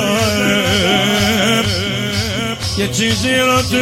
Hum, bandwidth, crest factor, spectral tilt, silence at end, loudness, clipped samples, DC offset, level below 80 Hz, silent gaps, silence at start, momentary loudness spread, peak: none; 16.5 kHz; 12 dB; -3.5 dB/octave; 0 s; -14 LUFS; under 0.1%; 0.2%; -38 dBFS; none; 0 s; 5 LU; -2 dBFS